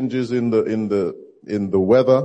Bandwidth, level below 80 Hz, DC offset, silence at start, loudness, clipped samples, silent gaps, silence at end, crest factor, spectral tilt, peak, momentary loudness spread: 8.4 kHz; -62 dBFS; under 0.1%; 0 s; -20 LUFS; under 0.1%; none; 0 s; 16 dB; -8 dB/octave; -2 dBFS; 12 LU